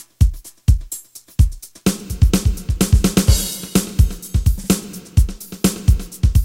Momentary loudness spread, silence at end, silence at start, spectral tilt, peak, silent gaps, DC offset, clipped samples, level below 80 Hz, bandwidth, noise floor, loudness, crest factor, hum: 6 LU; 0 s; 0.2 s; -5.5 dB/octave; 0 dBFS; none; under 0.1%; under 0.1%; -20 dBFS; 16.5 kHz; -35 dBFS; -19 LUFS; 16 dB; none